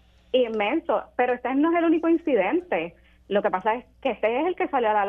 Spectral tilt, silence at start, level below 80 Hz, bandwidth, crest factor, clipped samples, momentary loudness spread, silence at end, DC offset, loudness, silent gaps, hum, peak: -7.5 dB/octave; 0.35 s; -58 dBFS; 3.7 kHz; 14 dB; under 0.1%; 7 LU; 0 s; under 0.1%; -24 LUFS; none; none; -10 dBFS